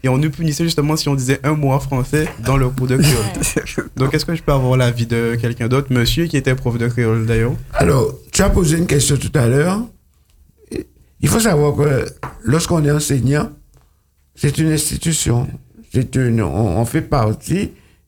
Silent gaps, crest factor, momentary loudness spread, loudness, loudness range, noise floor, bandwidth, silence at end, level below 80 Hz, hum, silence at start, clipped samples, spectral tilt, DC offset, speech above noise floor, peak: none; 16 dB; 7 LU; -17 LUFS; 2 LU; -57 dBFS; 19 kHz; 0.35 s; -30 dBFS; none; 0.05 s; under 0.1%; -5.5 dB/octave; under 0.1%; 41 dB; 0 dBFS